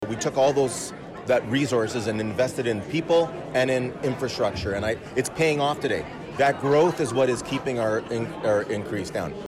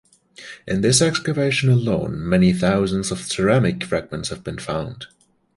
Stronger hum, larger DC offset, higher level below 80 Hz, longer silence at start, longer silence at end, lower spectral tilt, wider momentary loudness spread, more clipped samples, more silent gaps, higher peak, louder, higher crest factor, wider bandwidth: neither; neither; second, -52 dBFS vs -44 dBFS; second, 0 s vs 0.4 s; second, 0 s vs 0.5 s; about the same, -5 dB/octave vs -5 dB/octave; second, 8 LU vs 17 LU; neither; neither; second, -12 dBFS vs -4 dBFS; second, -25 LUFS vs -20 LUFS; second, 12 dB vs 18 dB; first, 15 kHz vs 11.5 kHz